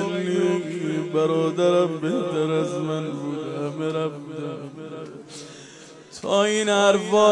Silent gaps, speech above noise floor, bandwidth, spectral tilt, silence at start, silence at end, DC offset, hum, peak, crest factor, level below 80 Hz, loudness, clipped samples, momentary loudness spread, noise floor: none; 23 dB; 11.5 kHz; -5 dB/octave; 0 s; 0 s; under 0.1%; none; -6 dBFS; 16 dB; -72 dBFS; -23 LUFS; under 0.1%; 20 LU; -44 dBFS